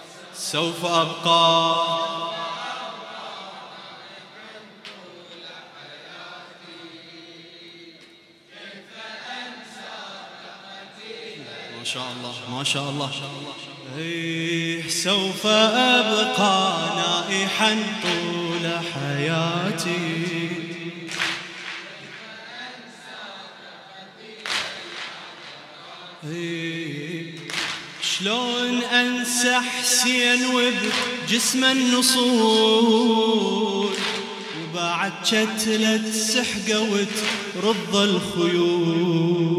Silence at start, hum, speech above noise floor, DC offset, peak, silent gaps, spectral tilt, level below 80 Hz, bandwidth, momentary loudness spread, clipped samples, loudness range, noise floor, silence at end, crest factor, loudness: 0 s; none; 29 dB; under 0.1%; -2 dBFS; none; -3 dB/octave; -68 dBFS; 16 kHz; 23 LU; under 0.1%; 20 LU; -50 dBFS; 0 s; 22 dB; -21 LUFS